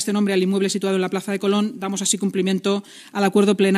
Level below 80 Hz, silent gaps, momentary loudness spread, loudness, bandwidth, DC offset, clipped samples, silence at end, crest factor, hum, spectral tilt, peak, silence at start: -68 dBFS; none; 6 LU; -21 LUFS; 14 kHz; under 0.1%; under 0.1%; 0 s; 16 dB; none; -4.5 dB/octave; -4 dBFS; 0 s